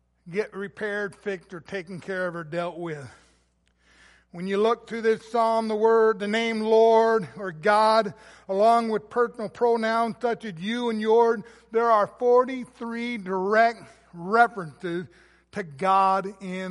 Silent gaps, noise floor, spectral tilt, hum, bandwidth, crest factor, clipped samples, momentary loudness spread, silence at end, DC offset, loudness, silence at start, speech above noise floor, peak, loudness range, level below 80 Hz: none; -66 dBFS; -5.5 dB/octave; none; 11.5 kHz; 20 dB; under 0.1%; 14 LU; 0 s; under 0.1%; -24 LUFS; 0.25 s; 42 dB; -4 dBFS; 10 LU; -66 dBFS